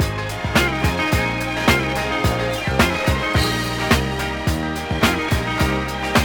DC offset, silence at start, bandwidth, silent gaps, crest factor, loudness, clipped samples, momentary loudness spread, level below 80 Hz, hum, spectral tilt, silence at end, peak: under 0.1%; 0 s; over 20 kHz; none; 18 dB; -19 LUFS; under 0.1%; 5 LU; -30 dBFS; none; -4.5 dB/octave; 0 s; -2 dBFS